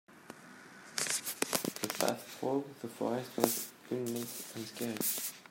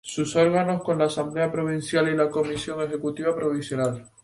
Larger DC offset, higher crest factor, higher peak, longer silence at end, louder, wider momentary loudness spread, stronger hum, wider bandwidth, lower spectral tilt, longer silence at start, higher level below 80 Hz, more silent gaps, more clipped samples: neither; first, 30 dB vs 16 dB; about the same, -8 dBFS vs -8 dBFS; second, 0 s vs 0.15 s; second, -36 LUFS vs -24 LUFS; first, 18 LU vs 7 LU; neither; first, 16.5 kHz vs 11.5 kHz; second, -3 dB/octave vs -5.5 dB/octave; about the same, 0.1 s vs 0.05 s; second, -80 dBFS vs -60 dBFS; neither; neither